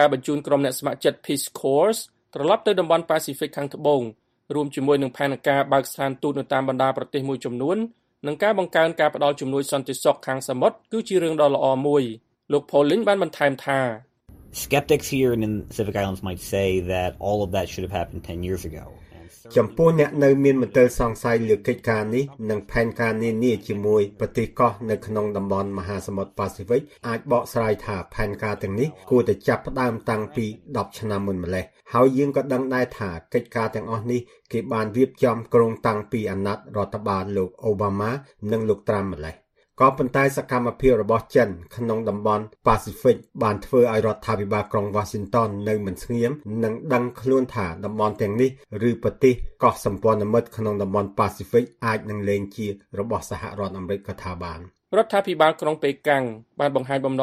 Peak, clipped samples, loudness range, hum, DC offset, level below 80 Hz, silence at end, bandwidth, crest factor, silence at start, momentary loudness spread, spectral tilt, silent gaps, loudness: -2 dBFS; under 0.1%; 4 LU; none; under 0.1%; -46 dBFS; 0 s; 15.5 kHz; 20 dB; 0 s; 10 LU; -6 dB/octave; none; -23 LUFS